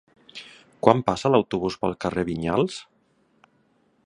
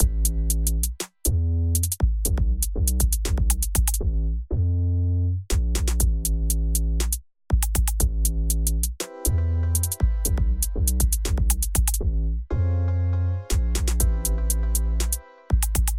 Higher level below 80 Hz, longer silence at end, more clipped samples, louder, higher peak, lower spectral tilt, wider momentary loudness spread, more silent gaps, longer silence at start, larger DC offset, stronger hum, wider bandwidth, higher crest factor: second, -52 dBFS vs -24 dBFS; first, 1.25 s vs 0 s; neither; about the same, -23 LUFS vs -24 LUFS; first, 0 dBFS vs -6 dBFS; first, -6.5 dB/octave vs -4.5 dB/octave; first, 21 LU vs 4 LU; neither; first, 0.35 s vs 0 s; neither; neither; second, 11 kHz vs 17 kHz; first, 26 dB vs 16 dB